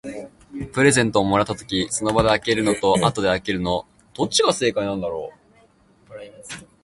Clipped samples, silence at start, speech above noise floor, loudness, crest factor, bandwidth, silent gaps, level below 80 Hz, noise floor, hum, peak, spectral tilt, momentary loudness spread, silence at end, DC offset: under 0.1%; 0.05 s; 36 dB; -20 LUFS; 20 dB; 11.5 kHz; none; -46 dBFS; -56 dBFS; none; -2 dBFS; -4 dB/octave; 19 LU; 0.2 s; under 0.1%